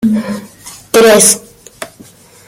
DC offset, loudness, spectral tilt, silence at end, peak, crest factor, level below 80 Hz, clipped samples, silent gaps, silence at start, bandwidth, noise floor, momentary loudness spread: under 0.1%; -8 LUFS; -2.5 dB/octave; 0.6 s; 0 dBFS; 12 dB; -48 dBFS; 0.2%; none; 0 s; over 20 kHz; -39 dBFS; 24 LU